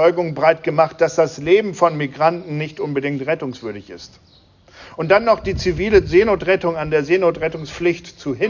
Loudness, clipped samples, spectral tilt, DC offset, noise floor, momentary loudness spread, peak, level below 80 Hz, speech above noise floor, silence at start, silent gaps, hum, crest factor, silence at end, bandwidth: -18 LUFS; under 0.1%; -6 dB/octave; under 0.1%; -49 dBFS; 13 LU; -2 dBFS; -40 dBFS; 31 dB; 0 s; none; none; 16 dB; 0 s; 7.4 kHz